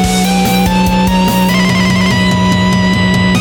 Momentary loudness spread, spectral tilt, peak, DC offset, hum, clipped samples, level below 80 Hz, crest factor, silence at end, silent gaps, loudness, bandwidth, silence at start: 1 LU; -5 dB/octave; -2 dBFS; under 0.1%; none; under 0.1%; -26 dBFS; 8 dB; 0 s; none; -10 LUFS; 19.5 kHz; 0 s